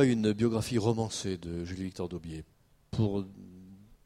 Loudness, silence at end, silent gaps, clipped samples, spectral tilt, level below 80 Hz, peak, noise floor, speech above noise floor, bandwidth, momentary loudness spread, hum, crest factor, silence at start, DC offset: -32 LUFS; 0.1 s; none; under 0.1%; -6 dB/octave; -56 dBFS; -12 dBFS; -53 dBFS; 22 dB; 14 kHz; 18 LU; none; 20 dB; 0 s; under 0.1%